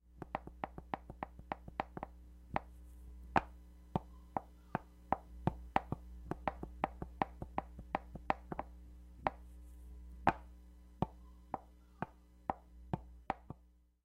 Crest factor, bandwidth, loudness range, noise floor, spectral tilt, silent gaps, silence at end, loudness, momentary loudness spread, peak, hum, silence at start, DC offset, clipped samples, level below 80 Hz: 32 dB; 16 kHz; 5 LU; -67 dBFS; -7.5 dB/octave; none; 0.25 s; -43 LUFS; 19 LU; -10 dBFS; none; 0.05 s; under 0.1%; under 0.1%; -54 dBFS